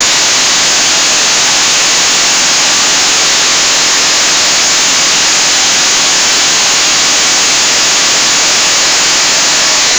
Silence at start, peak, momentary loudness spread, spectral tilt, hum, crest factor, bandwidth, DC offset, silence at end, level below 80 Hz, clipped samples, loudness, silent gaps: 0 s; 0 dBFS; 0 LU; 1.5 dB/octave; none; 8 dB; over 20 kHz; 0.4%; 0 s; -46 dBFS; under 0.1%; -6 LUFS; none